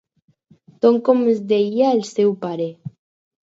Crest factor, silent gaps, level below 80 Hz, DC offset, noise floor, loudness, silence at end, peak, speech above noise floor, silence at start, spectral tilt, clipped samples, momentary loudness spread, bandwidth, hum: 18 dB; none; -74 dBFS; under 0.1%; -52 dBFS; -18 LUFS; 0.6 s; -2 dBFS; 35 dB; 0.85 s; -6.5 dB/octave; under 0.1%; 11 LU; 8 kHz; none